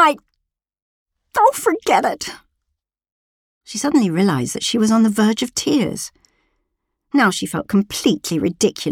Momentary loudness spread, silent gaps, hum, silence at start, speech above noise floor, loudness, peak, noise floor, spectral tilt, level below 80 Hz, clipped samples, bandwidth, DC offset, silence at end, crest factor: 10 LU; 0.82-1.06 s, 3.12-3.61 s; none; 0 s; 60 dB; -18 LUFS; 0 dBFS; -77 dBFS; -4.5 dB/octave; -56 dBFS; under 0.1%; 18 kHz; under 0.1%; 0 s; 18 dB